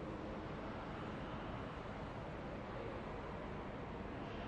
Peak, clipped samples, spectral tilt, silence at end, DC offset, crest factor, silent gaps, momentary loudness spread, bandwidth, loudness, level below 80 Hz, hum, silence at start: -34 dBFS; under 0.1%; -7.5 dB/octave; 0 s; under 0.1%; 12 dB; none; 1 LU; 10.5 kHz; -47 LUFS; -56 dBFS; none; 0 s